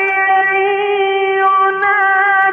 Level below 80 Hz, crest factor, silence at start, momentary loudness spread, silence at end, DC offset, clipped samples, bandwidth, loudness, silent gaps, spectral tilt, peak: -64 dBFS; 10 dB; 0 s; 4 LU; 0 s; under 0.1%; under 0.1%; 3.7 kHz; -12 LUFS; none; -4.5 dB/octave; -4 dBFS